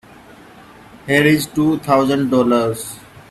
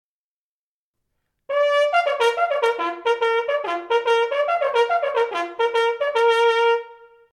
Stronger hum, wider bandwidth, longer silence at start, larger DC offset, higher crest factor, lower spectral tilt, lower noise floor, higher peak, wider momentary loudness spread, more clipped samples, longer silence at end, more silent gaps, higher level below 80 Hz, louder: neither; first, 14.5 kHz vs 11.5 kHz; second, 0.95 s vs 1.5 s; neither; about the same, 18 dB vs 14 dB; first, -5.5 dB/octave vs -0.5 dB/octave; second, -42 dBFS vs under -90 dBFS; first, 0 dBFS vs -6 dBFS; first, 16 LU vs 6 LU; neither; about the same, 0.3 s vs 0.4 s; neither; first, -52 dBFS vs -74 dBFS; first, -16 LUFS vs -20 LUFS